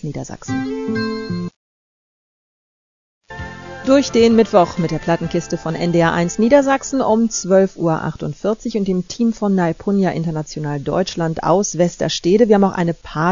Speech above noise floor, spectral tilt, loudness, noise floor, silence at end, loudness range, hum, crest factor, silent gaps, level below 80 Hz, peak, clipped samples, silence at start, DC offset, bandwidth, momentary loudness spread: over 73 dB; -5.5 dB/octave; -17 LUFS; under -90 dBFS; 0 s; 8 LU; none; 18 dB; 1.56-3.21 s; -44 dBFS; 0 dBFS; under 0.1%; 0 s; 0.3%; 7.4 kHz; 12 LU